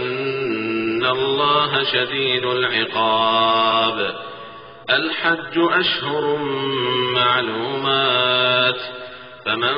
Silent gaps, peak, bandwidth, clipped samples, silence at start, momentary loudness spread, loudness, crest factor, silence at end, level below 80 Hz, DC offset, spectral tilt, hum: none; -4 dBFS; 5.4 kHz; under 0.1%; 0 s; 11 LU; -18 LUFS; 14 dB; 0 s; -60 dBFS; under 0.1%; -1 dB/octave; none